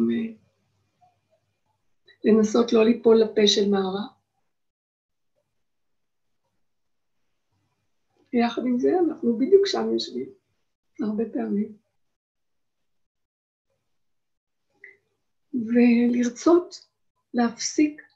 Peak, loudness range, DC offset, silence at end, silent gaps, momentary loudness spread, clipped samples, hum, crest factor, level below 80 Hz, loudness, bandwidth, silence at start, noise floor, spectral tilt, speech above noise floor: -6 dBFS; 12 LU; under 0.1%; 0.2 s; 4.70-5.09 s, 10.75-10.83 s, 12.16-12.35 s, 13.06-13.15 s, 13.25-13.65 s, 14.37-14.47 s, 17.10-17.15 s; 13 LU; under 0.1%; none; 20 dB; -70 dBFS; -22 LUFS; 8 kHz; 0 s; -84 dBFS; -4.5 dB/octave; 62 dB